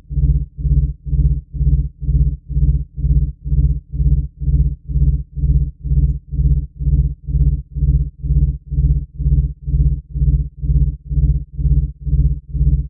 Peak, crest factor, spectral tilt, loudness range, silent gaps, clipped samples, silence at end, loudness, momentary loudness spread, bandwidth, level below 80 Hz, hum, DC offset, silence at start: -2 dBFS; 14 dB; -16.5 dB/octave; 0 LU; none; under 0.1%; 0 s; -19 LUFS; 2 LU; 0.6 kHz; -18 dBFS; none; under 0.1%; 0.1 s